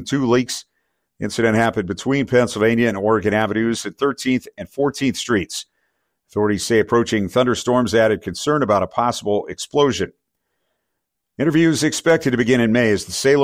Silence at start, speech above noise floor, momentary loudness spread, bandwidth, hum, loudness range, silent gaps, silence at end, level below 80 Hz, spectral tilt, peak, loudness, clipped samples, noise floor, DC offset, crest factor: 0 s; 60 dB; 7 LU; 16 kHz; none; 3 LU; none; 0 s; -50 dBFS; -5 dB/octave; -4 dBFS; -19 LUFS; under 0.1%; -78 dBFS; under 0.1%; 14 dB